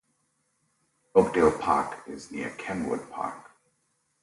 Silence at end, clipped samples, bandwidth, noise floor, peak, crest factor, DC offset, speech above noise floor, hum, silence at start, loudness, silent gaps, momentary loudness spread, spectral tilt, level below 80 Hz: 0.8 s; under 0.1%; 11.5 kHz; -74 dBFS; -6 dBFS; 24 dB; under 0.1%; 47 dB; none; 1.15 s; -27 LUFS; none; 15 LU; -6 dB/octave; -56 dBFS